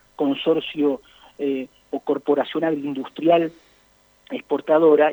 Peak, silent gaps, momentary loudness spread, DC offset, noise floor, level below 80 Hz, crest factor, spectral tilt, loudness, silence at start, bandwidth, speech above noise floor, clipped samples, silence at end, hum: -4 dBFS; none; 13 LU; under 0.1%; -58 dBFS; -66 dBFS; 16 dB; -7 dB/octave; -22 LUFS; 0.2 s; over 20 kHz; 38 dB; under 0.1%; 0 s; none